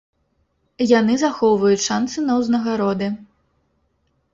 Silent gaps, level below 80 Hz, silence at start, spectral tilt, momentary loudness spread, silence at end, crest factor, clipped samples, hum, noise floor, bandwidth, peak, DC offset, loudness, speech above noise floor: none; -58 dBFS; 0.8 s; -4.5 dB/octave; 8 LU; 1.1 s; 18 dB; under 0.1%; none; -67 dBFS; 7.8 kHz; -2 dBFS; under 0.1%; -19 LUFS; 49 dB